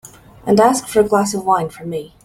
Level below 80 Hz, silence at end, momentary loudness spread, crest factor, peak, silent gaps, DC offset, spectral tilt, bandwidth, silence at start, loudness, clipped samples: -50 dBFS; 0.2 s; 14 LU; 16 dB; -2 dBFS; none; under 0.1%; -5 dB/octave; 16 kHz; 0.05 s; -16 LUFS; under 0.1%